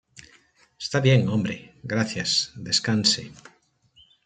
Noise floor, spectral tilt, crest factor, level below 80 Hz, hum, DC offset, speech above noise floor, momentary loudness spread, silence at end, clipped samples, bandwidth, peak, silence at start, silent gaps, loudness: -61 dBFS; -4 dB/octave; 22 dB; -62 dBFS; none; under 0.1%; 38 dB; 13 LU; 0.9 s; under 0.1%; 9.4 kHz; -4 dBFS; 0.15 s; none; -23 LUFS